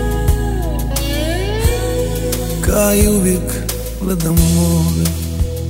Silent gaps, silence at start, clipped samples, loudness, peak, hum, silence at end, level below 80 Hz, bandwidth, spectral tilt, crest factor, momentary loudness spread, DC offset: none; 0 s; under 0.1%; -16 LUFS; 0 dBFS; none; 0 s; -20 dBFS; 16.5 kHz; -5.5 dB/octave; 16 dB; 8 LU; under 0.1%